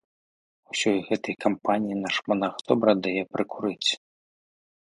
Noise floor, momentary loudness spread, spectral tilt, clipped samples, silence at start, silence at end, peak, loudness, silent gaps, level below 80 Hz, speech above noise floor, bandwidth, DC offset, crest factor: under -90 dBFS; 7 LU; -4 dB/octave; under 0.1%; 0.75 s; 0.9 s; -4 dBFS; -26 LUFS; none; -68 dBFS; over 65 dB; 11.5 kHz; under 0.1%; 22 dB